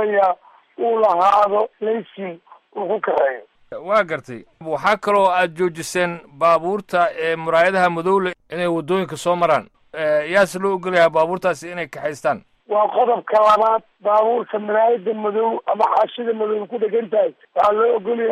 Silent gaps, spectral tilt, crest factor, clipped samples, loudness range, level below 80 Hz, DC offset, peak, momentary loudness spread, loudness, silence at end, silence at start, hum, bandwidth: none; -5 dB/octave; 14 dB; under 0.1%; 2 LU; -62 dBFS; under 0.1%; -4 dBFS; 11 LU; -19 LUFS; 0 s; 0 s; none; 13.5 kHz